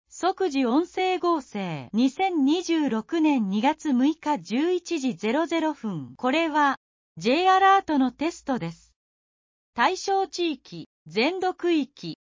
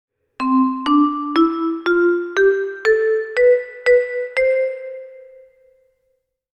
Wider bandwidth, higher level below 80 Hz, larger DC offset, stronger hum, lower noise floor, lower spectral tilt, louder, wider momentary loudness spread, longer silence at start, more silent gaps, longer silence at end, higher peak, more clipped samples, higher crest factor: second, 7.6 kHz vs 8.8 kHz; second, -66 dBFS vs -56 dBFS; neither; neither; first, under -90 dBFS vs -69 dBFS; about the same, -5 dB/octave vs -4 dB/octave; second, -24 LUFS vs -17 LUFS; first, 11 LU vs 7 LU; second, 0.15 s vs 0.4 s; first, 6.77-7.15 s, 8.96-9.73 s, 10.86-11.06 s vs none; second, 0.2 s vs 1.4 s; second, -8 dBFS vs -4 dBFS; neither; about the same, 16 dB vs 14 dB